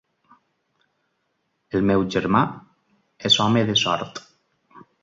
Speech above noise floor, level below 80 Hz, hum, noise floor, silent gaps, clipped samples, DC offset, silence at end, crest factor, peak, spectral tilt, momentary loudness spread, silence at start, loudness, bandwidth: 52 dB; -54 dBFS; none; -73 dBFS; none; under 0.1%; under 0.1%; 0.25 s; 20 dB; -4 dBFS; -4.5 dB/octave; 16 LU; 1.75 s; -20 LUFS; 7.8 kHz